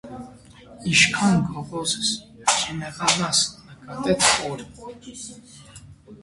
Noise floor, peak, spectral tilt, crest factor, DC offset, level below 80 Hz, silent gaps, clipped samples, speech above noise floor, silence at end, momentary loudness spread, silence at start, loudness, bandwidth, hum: -46 dBFS; 0 dBFS; -2.5 dB/octave; 24 dB; under 0.1%; -52 dBFS; none; under 0.1%; 23 dB; 0.05 s; 21 LU; 0.05 s; -21 LUFS; 11.5 kHz; none